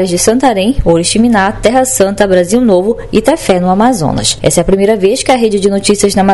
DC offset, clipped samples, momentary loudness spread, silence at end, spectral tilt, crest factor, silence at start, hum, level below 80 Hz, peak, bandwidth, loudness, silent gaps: 2%; 0.8%; 2 LU; 0 s; -4.5 dB/octave; 10 dB; 0 s; none; -28 dBFS; 0 dBFS; 12 kHz; -9 LUFS; none